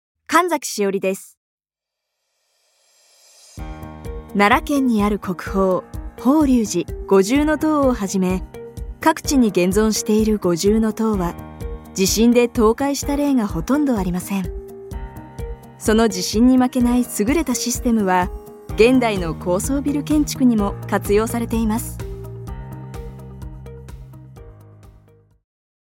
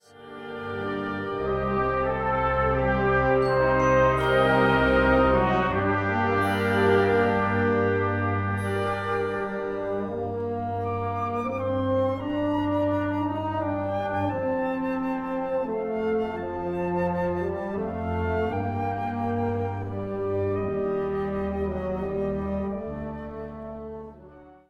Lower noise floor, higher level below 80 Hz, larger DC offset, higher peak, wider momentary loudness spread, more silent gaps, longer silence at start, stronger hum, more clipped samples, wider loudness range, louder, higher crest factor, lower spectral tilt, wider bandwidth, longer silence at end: first, -84 dBFS vs -49 dBFS; first, -36 dBFS vs -42 dBFS; neither; first, -2 dBFS vs -8 dBFS; first, 19 LU vs 10 LU; first, 1.37-1.58 s vs none; first, 0.3 s vs 0.15 s; neither; neither; first, 10 LU vs 7 LU; first, -18 LUFS vs -25 LUFS; about the same, 18 dB vs 16 dB; second, -5 dB/octave vs -7.5 dB/octave; first, 17 kHz vs 14 kHz; first, 1.05 s vs 0.15 s